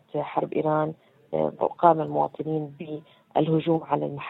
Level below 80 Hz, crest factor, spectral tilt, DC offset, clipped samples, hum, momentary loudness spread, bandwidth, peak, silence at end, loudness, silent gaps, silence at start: -68 dBFS; 22 dB; -10.5 dB/octave; under 0.1%; under 0.1%; none; 12 LU; 4.1 kHz; -2 dBFS; 0 s; -26 LUFS; none; 0.15 s